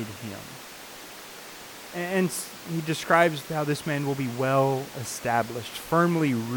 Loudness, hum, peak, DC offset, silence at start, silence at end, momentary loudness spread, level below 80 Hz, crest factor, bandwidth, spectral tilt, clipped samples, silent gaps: -26 LUFS; none; -6 dBFS; under 0.1%; 0 s; 0 s; 18 LU; -64 dBFS; 22 dB; 19 kHz; -5 dB/octave; under 0.1%; none